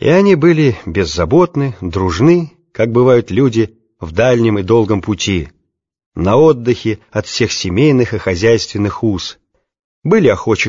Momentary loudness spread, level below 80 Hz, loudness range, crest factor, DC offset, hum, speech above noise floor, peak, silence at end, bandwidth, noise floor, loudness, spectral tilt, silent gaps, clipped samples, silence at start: 11 LU; -38 dBFS; 2 LU; 12 dB; under 0.1%; none; 54 dB; 0 dBFS; 0 s; 7.6 kHz; -66 dBFS; -13 LUFS; -6 dB/octave; 6.06-6.12 s, 9.84-10.02 s; under 0.1%; 0 s